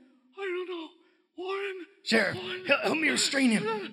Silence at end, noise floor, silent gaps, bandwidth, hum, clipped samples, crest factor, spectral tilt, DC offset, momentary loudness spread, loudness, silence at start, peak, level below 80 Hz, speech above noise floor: 0 s; -62 dBFS; none; 15 kHz; none; under 0.1%; 22 dB; -3 dB/octave; under 0.1%; 14 LU; -28 LUFS; 0.35 s; -8 dBFS; -82 dBFS; 35 dB